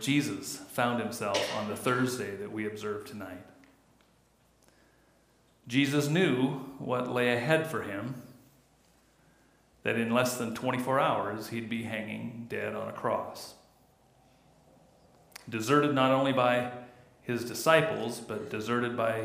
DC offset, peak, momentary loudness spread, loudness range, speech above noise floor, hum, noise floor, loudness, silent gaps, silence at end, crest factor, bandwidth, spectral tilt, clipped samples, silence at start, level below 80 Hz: under 0.1%; -10 dBFS; 14 LU; 10 LU; 36 dB; none; -66 dBFS; -30 LUFS; none; 0 s; 22 dB; 15.5 kHz; -5 dB/octave; under 0.1%; 0 s; -72 dBFS